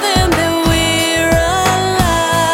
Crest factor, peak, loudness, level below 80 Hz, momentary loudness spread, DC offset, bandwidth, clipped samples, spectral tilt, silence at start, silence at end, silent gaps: 12 dB; 0 dBFS; -13 LUFS; -26 dBFS; 1 LU; under 0.1%; 18.5 kHz; under 0.1%; -4 dB/octave; 0 s; 0 s; none